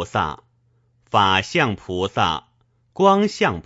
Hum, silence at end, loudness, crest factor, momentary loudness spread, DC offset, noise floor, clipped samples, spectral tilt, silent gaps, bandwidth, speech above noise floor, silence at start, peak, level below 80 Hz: none; 0.05 s; -20 LUFS; 20 dB; 12 LU; under 0.1%; -62 dBFS; under 0.1%; -5 dB/octave; none; 8 kHz; 43 dB; 0 s; -2 dBFS; -50 dBFS